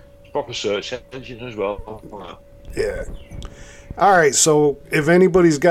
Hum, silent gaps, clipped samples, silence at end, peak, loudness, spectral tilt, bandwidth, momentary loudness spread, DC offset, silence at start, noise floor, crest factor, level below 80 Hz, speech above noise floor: none; none; under 0.1%; 0 s; -2 dBFS; -17 LUFS; -4 dB/octave; 15 kHz; 23 LU; under 0.1%; 0.35 s; -38 dBFS; 16 dB; -40 dBFS; 19 dB